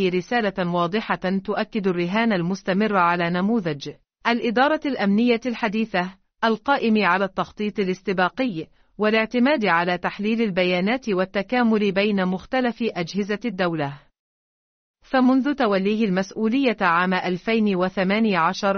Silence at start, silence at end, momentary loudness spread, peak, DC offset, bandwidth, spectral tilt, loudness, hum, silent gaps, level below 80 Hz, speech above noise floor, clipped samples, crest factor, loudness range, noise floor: 0 s; 0 s; 7 LU; -6 dBFS; under 0.1%; 6.6 kHz; -4 dB/octave; -22 LUFS; none; 14.19-14.94 s; -58 dBFS; over 69 dB; under 0.1%; 16 dB; 3 LU; under -90 dBFS